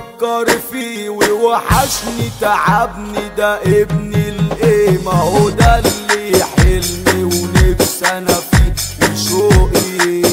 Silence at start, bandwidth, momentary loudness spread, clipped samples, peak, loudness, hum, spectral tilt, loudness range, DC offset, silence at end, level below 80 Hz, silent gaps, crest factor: 0 s; 16.5 kHz; 7 LU; under 0.1%; 0 dBFS; -13 LUFS; none; -4.5 dB/octave; 2 LU; under 0.1%; 0 s; -20 dBFS; none; 12 dB